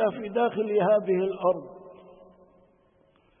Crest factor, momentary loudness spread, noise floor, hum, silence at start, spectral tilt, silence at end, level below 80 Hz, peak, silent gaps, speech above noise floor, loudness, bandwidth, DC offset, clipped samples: 16 dB; 14 LU; -63 dBFS; none; 0 s; -10.5 dB/octave; 1.45 s; -70 dBFS; -12 dBFS; none; 38 dB; -26 LUFS; 3.7 kHz; under 0.1%; under 0.1%